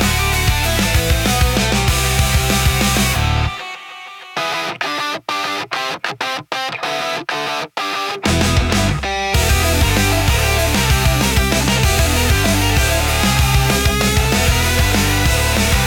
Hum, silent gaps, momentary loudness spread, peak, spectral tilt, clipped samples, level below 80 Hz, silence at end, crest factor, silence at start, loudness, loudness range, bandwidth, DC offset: none; none; 7 LU; -2 dBFS; -3.5 dB/octave; under 0.1%; -22 dBFS; 0 s; 14 dB; 0 s; -16 LUFS; 6 LU; 17.5 kHz; under 0.1%